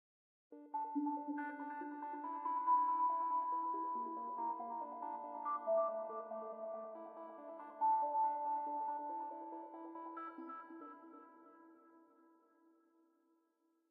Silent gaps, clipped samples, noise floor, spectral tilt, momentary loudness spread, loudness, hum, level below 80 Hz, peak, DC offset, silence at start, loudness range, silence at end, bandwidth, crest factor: none; under 0.1%; -80 dBFS; -7.5 dB/octave; 17 LU; -41 LUFS; none; under -90 dBFS; -26 dBFS; under 0.1%; 0.5 s; 15 LU; 1.9 s; 3.4 kHz; 16 dB